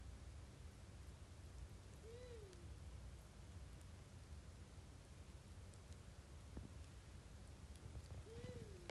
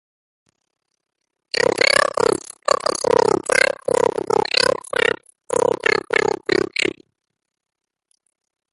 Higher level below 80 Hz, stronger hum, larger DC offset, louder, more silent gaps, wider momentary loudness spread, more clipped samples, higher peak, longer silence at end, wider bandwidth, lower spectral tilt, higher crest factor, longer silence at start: second, -60 dBFS vs -54 dBFS; neither; neither; second, -59 LUFS vs -18 LUFS; neither; about the same, 5 LU vs 6 LU; neither; second, -36 dBFS vs 0 dBFS; second, 0 s vs 1.8 s; about the same, 12 kHz vs 12 kHz; first, -5.5 dB/octave vs -2.5 dB/octave; about the same, 22 dB vs 20 dB; second, 0 s vs 1.55 s